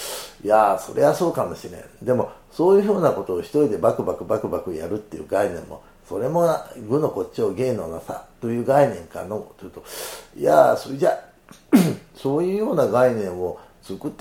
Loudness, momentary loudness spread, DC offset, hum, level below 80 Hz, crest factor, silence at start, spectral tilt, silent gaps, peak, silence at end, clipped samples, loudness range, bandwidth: -21 LUFS; 15 LU; under 0.1%; none; -54 dBFS; 20 dB; 0 s; -6.5 dB/octave; none; -2 dBFS; 0.05 s; under 0.1%; 4 LU; 17.5 kHz